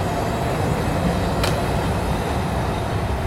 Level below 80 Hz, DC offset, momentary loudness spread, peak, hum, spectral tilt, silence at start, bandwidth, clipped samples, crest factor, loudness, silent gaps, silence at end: -30 dBFS; 0.2%; 2 LU; -8 dBFS; none; -6 dB/octave; 0 s; 16 kHz; under 0.1%; 14 dB; -22 LUFS; none; 0 s